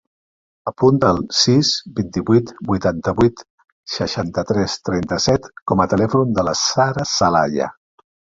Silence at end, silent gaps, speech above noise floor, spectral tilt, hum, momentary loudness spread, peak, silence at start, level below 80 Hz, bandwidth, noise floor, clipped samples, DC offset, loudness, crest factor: 0.65 s; 3.50-3.58 s, 3.72-3.83 s, 5.62-5.66 s; over 73 dB; -5 dB/octave; none; 9 LU; 0 dBFS; 0.65 s; -44 dBFS; 7.8 kHz; under -90 dBFS; under 0.1%; under 0.1%; -18 LUFS; 18 dB